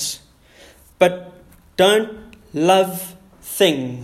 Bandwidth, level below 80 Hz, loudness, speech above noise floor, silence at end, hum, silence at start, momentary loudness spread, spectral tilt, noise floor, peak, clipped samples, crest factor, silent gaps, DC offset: 16 kHz; -54 dBFS; -18 LUFS; 31 dB; 0 s; none; 0 s; 19 LU; -3.5 dB/octave; -48 dBFS; 0 dBFS; under 0.1%; 20 dB; none; under 0.1%